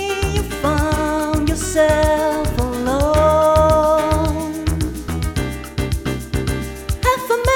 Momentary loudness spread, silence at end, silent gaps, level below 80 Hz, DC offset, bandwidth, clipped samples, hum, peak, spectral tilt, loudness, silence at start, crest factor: 10 LU; 0 s; none; -26 dBFS; under 0.1%; 19 kHz; under 0.1%; none; -2 dBFS; -5.5 dB/octave; -18 LUFS; 0 s; 16 dB